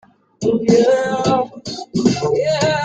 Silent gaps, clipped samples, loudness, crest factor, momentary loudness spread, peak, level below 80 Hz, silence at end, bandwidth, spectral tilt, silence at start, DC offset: none; under 0.1%; -17 LUFS; 14 dB; 10 LU; -2 dBFS; -52 dBFS; 0 s; 9.2 kHz; -5.5 dB/octave; 0.4 s; under 0.1%